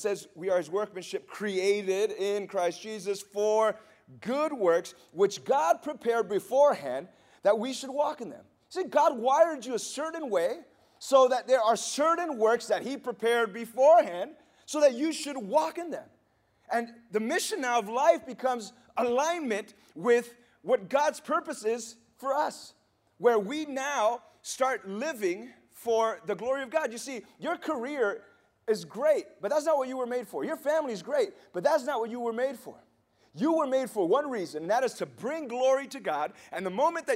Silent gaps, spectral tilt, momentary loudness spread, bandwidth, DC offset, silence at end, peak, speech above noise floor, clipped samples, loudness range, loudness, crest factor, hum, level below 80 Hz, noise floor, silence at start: none; -3.5 dB/octave; 12 LU; 16 kHz; under 0.1%; 0 s; -10 dBFS; 41 dB; under 0.1%; 4 LU; -29 LUFS; 18 dB; none; -80 dBFS; -69 dBFS; 0 s